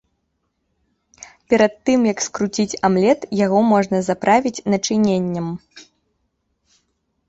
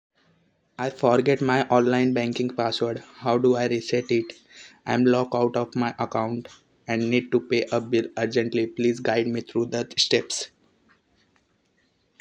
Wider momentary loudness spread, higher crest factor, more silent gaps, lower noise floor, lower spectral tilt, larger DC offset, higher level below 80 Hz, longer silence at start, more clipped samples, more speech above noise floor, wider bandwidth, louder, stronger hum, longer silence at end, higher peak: second, 6 LU vs 10 LU; about the same, 18 dB vs 20 dB; neither; first, -71 dBFS vs -67 dBFS; about the same, -5 dB/octave vs -5 dB/octave; neither; first, -58 dBFS vs -68 dBFS; first, 1.5 s vs 0.8 s; neither; first, 54 dB vs 44 dB; second, 8 kHz vs 9.8 kHz; first, -18 LUFS vs -24 LUFS; neither; second, 1.5 s vs 1.75 s; about the same, -2 dBFS vs -4 dBFS